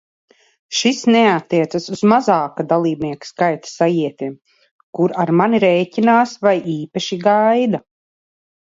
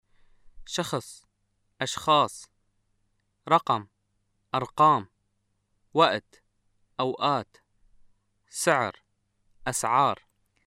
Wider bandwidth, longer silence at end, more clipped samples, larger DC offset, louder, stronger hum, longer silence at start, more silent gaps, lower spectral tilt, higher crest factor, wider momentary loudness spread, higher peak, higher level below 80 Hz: second, 7.8 kHz vs 16 kHz; first, 0.85 s vs 0.55 s; neither; neither; first, -16 LUFS vs -26 LUFS; neither; first, 0.7 s vs 0.45 s; first, 4.71-4.93 s vs none; first, -5.5 dB/octave vs -3.5 dB/octave; second, 16 dB vs 22 dB; second, 10 LU vs 16 LU; first, 0 dBFS vs -6 dBFS; about the same, -64 dBFS vs -62 dBFS